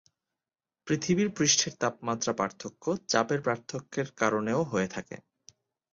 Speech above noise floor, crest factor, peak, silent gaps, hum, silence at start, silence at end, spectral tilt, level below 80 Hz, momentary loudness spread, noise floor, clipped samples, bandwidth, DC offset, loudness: over 61 dB; 20 dB; -10 dBFS; none; none; 0.85 s; 0.75 s; -3.5 dB/octave; -66 dBFS; 12 LU; under -90 dBFS; under 0.1%; 7.8 kHz; under 0.1%; -29 LUFS